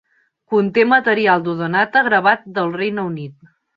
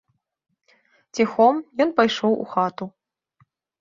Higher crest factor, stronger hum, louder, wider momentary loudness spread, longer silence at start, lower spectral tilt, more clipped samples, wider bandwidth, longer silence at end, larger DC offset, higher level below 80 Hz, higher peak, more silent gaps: about the same, 18 dB vs 22 dB; neither; first, -16 LUFS vs -21 LUFS; second, 11 LU vs 16 LU; second, 0.5 s vs 1.15 s; first, -8 dB/octave vs -5 dB/octave; neither; second, 5.4 kHz vs 7.6 kHz; second, 0.45 s vs 0.9 s; neither; about the same, -64 dBFS vs -68 dBFS; about the same, 0 dBFS vs -2 dBFS; neither